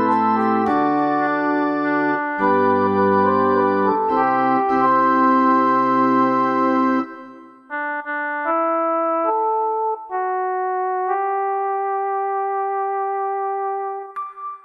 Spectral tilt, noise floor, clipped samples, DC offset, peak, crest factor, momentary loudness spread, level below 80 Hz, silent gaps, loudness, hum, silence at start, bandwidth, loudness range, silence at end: -8 dB/octave; -41 dBFS; under 0.1%; under 0.1%; -4 dBFS; 14 dB; 8 LU; -66 dBFS; none; -19 LUFS; none; 0 s; 6.6 kHz; 5 LU; 0.05 s